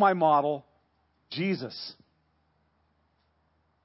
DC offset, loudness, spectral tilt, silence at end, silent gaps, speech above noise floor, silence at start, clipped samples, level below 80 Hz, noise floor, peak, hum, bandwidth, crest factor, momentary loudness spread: under 0.1%; -27 LUFS; -9.5 dB/octave; 1.95 s; none; 45 dB; 0 s; under 0.1%; -76 dBFS; -71 dBFS; -10 dBFS; none; 5.8 kHz; 20 dB; 17 LU